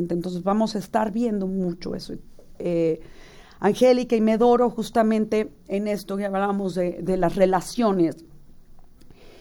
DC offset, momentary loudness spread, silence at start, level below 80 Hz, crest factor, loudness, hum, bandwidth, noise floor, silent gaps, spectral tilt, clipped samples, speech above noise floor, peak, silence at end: under 0.1%; 11 LU; 0 s; -48 dBFS; 18 dB; -23 LUFS; none; 18 kHz; -46 dBFS; none; -6.5 dB/octave; under 0.1%; 23 dB; -6 dBFS; 0.1 s